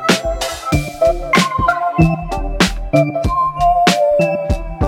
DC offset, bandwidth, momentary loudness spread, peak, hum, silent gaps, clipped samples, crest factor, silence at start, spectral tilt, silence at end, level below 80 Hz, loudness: under 0.1%; 17.5 kHz; 8 LU; 0 dBFS; none; none; under 0.1%; 14 dB; 0 s; -5 dB/octave; 0 s; -26 dBFS; -15 LUFS